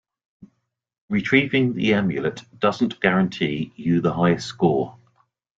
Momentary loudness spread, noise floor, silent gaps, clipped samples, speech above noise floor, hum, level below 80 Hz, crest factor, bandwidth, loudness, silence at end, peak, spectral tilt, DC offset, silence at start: 8 LU; -70 dBFS; 1.01-1.08 s; under 0.1%; 49 dB; none; -56 dBFS; 20 dB; 7.8 kHz; -21 LUFS; 0.65 s; -2 dBFS; -6.5 dB/octave; under 0.1%; 0.4 s